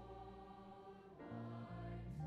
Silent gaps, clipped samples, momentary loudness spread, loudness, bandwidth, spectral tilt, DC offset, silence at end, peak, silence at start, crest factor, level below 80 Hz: none; under 0.1%; 8 LU; -54 LUFS; 8.6 kHz; -8.5 dB/octave; under 0.1%; 0 s; -38 dBFS; 0 s; 14 dB; -62 dBFS